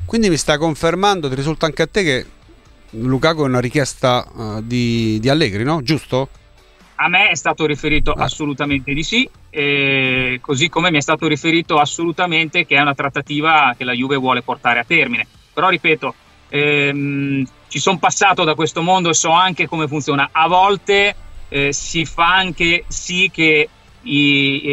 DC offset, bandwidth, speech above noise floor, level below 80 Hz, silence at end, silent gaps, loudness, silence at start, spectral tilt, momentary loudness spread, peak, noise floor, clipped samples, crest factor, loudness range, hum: under 0.1%; 13.5 kHz; 31 dB; -36 dBFS; 0 s; none; -16 LUFS; 0 s; -4 dB/octave; 8 LU; -2 dBFS; -47 dBFS; under 0.1%; 16 dB; 3 LU; none